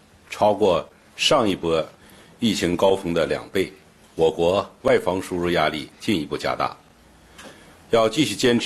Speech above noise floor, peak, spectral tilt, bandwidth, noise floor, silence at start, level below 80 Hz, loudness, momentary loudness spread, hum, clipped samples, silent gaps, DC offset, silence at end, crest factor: 31 dB; -6 dBFS; -4.5 dB/octave; 13 kHz; -52 dBFS; 0.3 s; -52 dBFS; -22 LUFS; 8 LU; none; under 0.1%; none; under 0.1%; 0 s; 18 dB